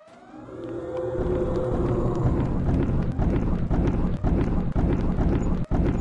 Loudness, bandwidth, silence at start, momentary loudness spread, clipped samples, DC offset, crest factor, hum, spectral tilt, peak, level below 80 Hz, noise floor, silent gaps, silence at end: -26 LUFS; 7.6 kHz; 0.1 s; 7 LU; under 0.1%; under 0.1%; 12 dB; none; -9.5 dB/octave; -12 dBFS; -28 dBFS; -44 dBFS; none; 0 s